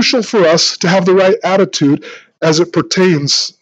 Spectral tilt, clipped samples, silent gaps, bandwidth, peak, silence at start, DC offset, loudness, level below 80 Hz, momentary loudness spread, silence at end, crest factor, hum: -4 dB/octave; under 0.1%; none; 8.8 kHz; 0 dBFS; 0 s; under 0.1%; -11 LUFS; -62 dBFS; 4 LU; 0.1 s; 12 dB; none